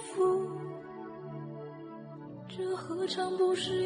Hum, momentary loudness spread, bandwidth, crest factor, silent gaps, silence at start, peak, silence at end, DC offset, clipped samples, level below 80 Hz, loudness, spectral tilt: none; 17 LU; 10 kHz; 14 dB; none; 0 s; -20 dBFS; 0 s; under 0.1%; under 0.1%; -74 dBFS; -34 LUFS; -5 dB/octave